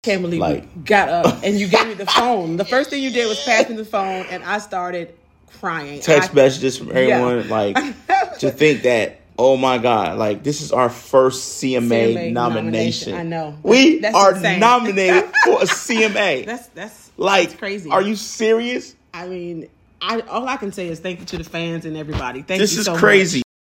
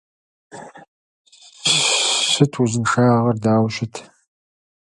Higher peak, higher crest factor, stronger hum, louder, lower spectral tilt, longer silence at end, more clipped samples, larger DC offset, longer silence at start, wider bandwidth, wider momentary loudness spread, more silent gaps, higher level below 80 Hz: about the same, 0 dBFS vs 0 dBFS; about the same, 18 dB vs 20 dB; neither; about the same, -17 LUFS vs -17 LUFS; about the same, -4 dB/octave vs -4 dB/octave; second, 0.2 s vs 0.8 s; neither; neither; second, 0.05 s vs 0.55 s; first, 16.5 kHz vs 11.5 kHz; second, 14 LU vs 17 LU; second, none vs 0.88-1.25 s; first, -50 dBFS vs -58 dBFS